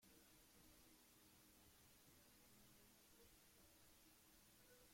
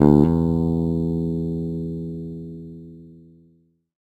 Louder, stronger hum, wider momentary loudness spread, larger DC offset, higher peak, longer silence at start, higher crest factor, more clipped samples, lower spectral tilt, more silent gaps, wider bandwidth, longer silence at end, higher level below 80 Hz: second, -70 LUFS vs -22 LUFS; neither; second, 1 LU vs 21 LU; neither; second, -58 dBFS vs 0 dBFS; about the same, 0 s vs 0 s; second, 14 dB vs 22 dB; neither; second, -2.5 dB/octave vs -11 dB/octave; neither; first, 16.5 kHz vs 7.8 kHz; second, 0 s vs 0.8 s; second, -82 dBFS vs -38 dBFS